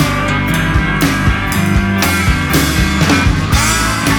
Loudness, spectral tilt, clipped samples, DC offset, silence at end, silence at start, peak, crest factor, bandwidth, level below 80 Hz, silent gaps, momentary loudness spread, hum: -13 LUFS; -4.5 dB/octave; under 0.1%; under 0.1%; 0 s; 0 s; 0 dBFS; 12 dB; over 20 kHz; -20 dBFS; none; 3 LU; none